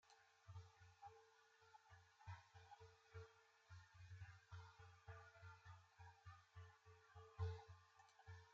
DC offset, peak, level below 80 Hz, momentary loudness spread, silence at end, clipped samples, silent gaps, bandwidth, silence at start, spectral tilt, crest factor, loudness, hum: under 0.1%; -38 dBFS; -78 dBFS; 11 LU; 0 s; under 0.1%; none; 7.4 kHz; 0.05 s; -4 dB/octave; 24 dB; -62 LUFS; none